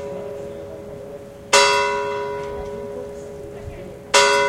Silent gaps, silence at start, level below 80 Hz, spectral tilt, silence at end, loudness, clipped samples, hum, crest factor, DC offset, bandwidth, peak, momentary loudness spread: none; 0 s; -48 dBFS; -1.5 dB/octave; 0 s; -19 LUFS; under 0.1%; none; 22 dB; under 0.1%; 16.5 kHz; 0 dBFS; 21 LU